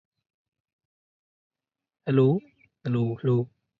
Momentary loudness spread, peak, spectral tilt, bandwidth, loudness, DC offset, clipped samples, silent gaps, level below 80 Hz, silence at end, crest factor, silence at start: 12 LU; -10 dBFS; -10.5 dB/octave; 4.7 kHz; -25 LUFS; under 0.1%; under 0.1%; none; -68 dBFS; 0.35 s; 20 dB; 2.05 s